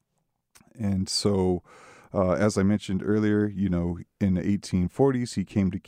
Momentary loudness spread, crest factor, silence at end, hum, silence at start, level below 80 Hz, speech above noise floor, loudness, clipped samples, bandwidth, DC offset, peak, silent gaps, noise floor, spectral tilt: 6 LU; 16 dB; 0.1 s; none; 0.75 s; -52 dBFS; 52 dB; -26 LUFS; under 0.1%; 13 kHz; under 0.1%; -10 dBFS; none; -76 dBFS; -6.5 dB/octave